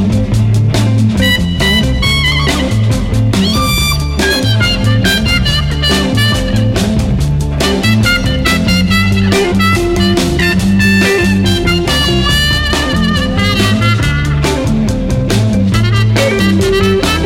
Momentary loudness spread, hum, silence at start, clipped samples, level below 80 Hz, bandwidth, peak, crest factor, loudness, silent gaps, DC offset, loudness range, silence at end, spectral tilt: 3 LU; none; 0 s; under 0.1%; -20 dBFS; 17 kHz; 0 dBFS; 10 dB; -11 LUFS; none; under 0.1%; 1 LU; 0 s; -5 dB/octave